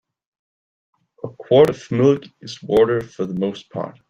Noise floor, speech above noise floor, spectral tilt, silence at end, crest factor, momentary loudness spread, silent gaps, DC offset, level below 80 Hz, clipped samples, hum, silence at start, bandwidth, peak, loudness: under -90 dBFS; over 71 dB; -7 dB/octave; 0.2 s; 18 dB; 20 LU; none; under 0.1%; -56 dBFS; under 0.1%; none; 1.25 s; 9.8 kHz; -2 dBFS; -18 LUFS